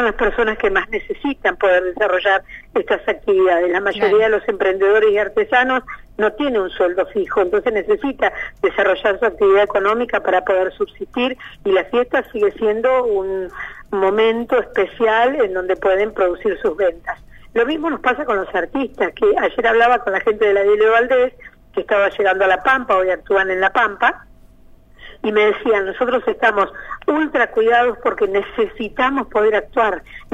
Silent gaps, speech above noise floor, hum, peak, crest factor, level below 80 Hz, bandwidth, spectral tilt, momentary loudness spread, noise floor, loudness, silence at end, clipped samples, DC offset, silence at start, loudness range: none; 28 dB; none; -4 dBFS; 14 dB; -44 dBFS; 7.8 kHz; -5.5 dB/octave; 8 LU; -45 dBFS; -17 LUFS; 0 s; under 0.1%; under 0.1%; 0 s; 3 LU